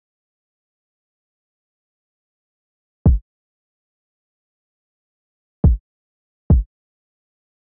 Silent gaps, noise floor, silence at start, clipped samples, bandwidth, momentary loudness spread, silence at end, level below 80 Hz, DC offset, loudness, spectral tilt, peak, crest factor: 3.22-5.63 s, 5.80-6.50 s; under -90 dBFS; 3.05 s; under 0.1%; 1.1 kHz; 7 LU; 1.15 s; -26 dBFS; under 0.1%; -19 LUFS; -12 dB/octave; -6 dBFS; 20 dB